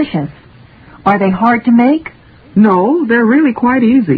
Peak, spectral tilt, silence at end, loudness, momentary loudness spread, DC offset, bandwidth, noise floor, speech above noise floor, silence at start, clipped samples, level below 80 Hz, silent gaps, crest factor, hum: 0 dBFS; -10 dB/octave; 0 s; -11 LUFS; 8 LU; under 0.1%; 4.8 kHz; -39 dBFS; 29 dB; 0 s; under 0.1%; -46 dBFS; none; 12 dB; none